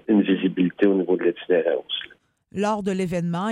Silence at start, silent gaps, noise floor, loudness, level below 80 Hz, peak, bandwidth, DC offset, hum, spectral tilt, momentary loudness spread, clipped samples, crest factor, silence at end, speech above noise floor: 0.1 s; none; -52 dBFS; -23 LUFS; -62 dBFS; -6 dBFS; 11 kHz; under 0.1%; none; -7 dB/octave; 10 LU; under 0.1%; 16 dB; 0 s; 29 dB